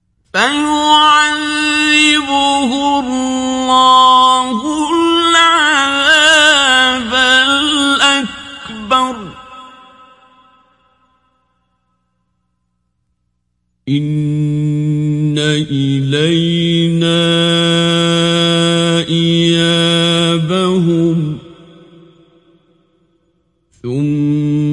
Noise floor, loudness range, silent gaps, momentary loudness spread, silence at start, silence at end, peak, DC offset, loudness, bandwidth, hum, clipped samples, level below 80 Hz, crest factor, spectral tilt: -67 dBFS; 13 LU; none; 9 LU; 0.35 s; 0 s; 0 dBFS; under 0.1%; -11 LUFS; 11.5 kHz; 60 Hz at -55 dBFS; under 0.1%; -48 dBFS; 14 dB; -4 dB/octave